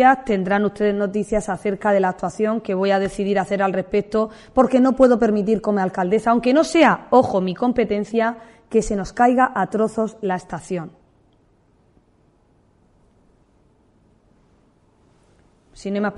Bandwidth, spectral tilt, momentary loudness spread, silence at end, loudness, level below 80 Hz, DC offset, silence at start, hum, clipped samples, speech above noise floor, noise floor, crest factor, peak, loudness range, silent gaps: 11.5 kHz; -6 dB/octave; 10 LU; 0 s; -19 LUFS; -48 dBFS; under 0.1%; 0 s; none; under 0.1%; 40 dB; -58 dBFS; 18 dB; -2 dBFS; 12 LU; none